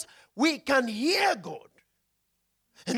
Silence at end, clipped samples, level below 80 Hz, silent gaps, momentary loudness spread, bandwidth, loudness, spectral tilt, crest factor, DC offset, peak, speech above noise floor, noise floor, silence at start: 0 s; under 0.1%; -72 dBFS; none; 18 LU; 17 kHz; -26 LUFS; -3 dB/octave; 18 dB; under 0.1%; -12 dBFS; 50 dB; -76 dBFS; 0 s